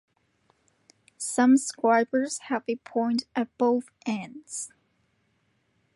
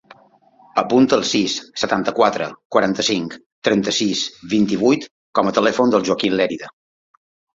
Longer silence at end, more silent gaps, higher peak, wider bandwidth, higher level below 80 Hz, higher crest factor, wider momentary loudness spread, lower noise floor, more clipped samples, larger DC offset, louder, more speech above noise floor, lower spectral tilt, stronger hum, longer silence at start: first, 1.3 s vs 0.85 s; second, none vs 2.65-2.70 s, 3.46-3.62 s, 5.11-5.33 s; second, -10 dBFS vs -2 dBFS; first, 11.5 kHz vs 7.8 kHz; second, -78 dBFS vs -58 dBFS; about the same, 18 dB vs 18 dB; first, 15 LU vs 8 LU; first, -71 dBFS vs -52 dBFS; neither; neither; second, -26 LUFS vs -18 LUFS; first, 45 dB vs 34 dB; about the same, -3.5 dB/octave vs -4 dB/octave; neither; first, 1.2 s vs 0.75 s